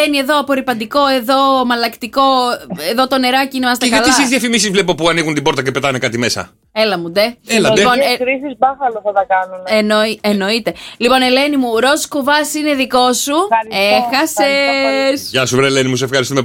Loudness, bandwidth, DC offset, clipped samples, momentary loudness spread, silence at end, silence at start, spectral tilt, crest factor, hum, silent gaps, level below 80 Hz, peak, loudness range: -13 LUFS; 17 kHz; under 0.1%; under 0.1%; 5 LU; 0 s; 0 s; -3.5 dB/octave; 14 dB; none; none; -48 dBFS; 0 dBFS; 2 LU